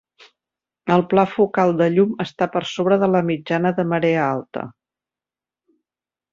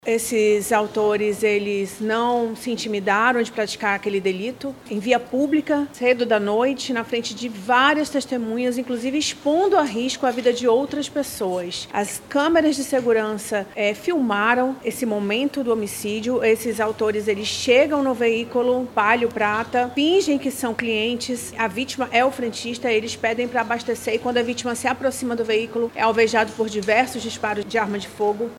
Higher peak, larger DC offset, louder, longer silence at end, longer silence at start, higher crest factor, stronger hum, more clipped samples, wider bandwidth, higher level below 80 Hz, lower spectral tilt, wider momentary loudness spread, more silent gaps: about the same, -2 dBFS vs -2 dBFS; neither; about the same, -19 LUFS vs -21 LUFS; first, 1.65 s vs 0 s; first, 0.85 s vs 0.05 s; about the same, 18 dB vs 20 dB; neither; neither; second, 7.4 kHz vs 16 kHz; about the same, -62 dBFS vs -60 dBFS; first, -7.5 dB/octave vs -3.5 dB/octave; first, 10 LU vs 7 LU; neither